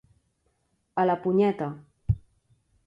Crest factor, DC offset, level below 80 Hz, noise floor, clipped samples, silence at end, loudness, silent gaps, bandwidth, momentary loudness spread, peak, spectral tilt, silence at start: 18 dB; under 0.1%; -46 dBFS; -72 dBFS; under 0.1%; 0.7 s; -27 LUFS; none; 7.2 kHz; 11 LU; -12 dBFS; -9.5 dB/octave; 0.95 s